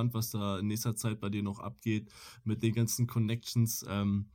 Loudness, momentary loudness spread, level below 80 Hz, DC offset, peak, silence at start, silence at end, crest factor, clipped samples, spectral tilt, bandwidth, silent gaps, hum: -34 LUFS; 7 LU; -64 dBFS; under 0.1%; -16 dBFS; 0 s; 0.05 s; 16 dB; under 0.1%; -5.5 dB/octave; 17 kHz; none; none